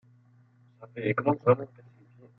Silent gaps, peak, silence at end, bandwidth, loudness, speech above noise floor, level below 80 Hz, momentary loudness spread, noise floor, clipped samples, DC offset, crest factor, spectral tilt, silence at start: none; -8 dBFS; 0.7 s; 4.1 kHz; -27 LUFS; 33 dB; -74 dBFS; 20 LU; -60 dBFS; under 0.1%; under 0.1%; 22 dB; -10.5 dB/octave; 0.8 s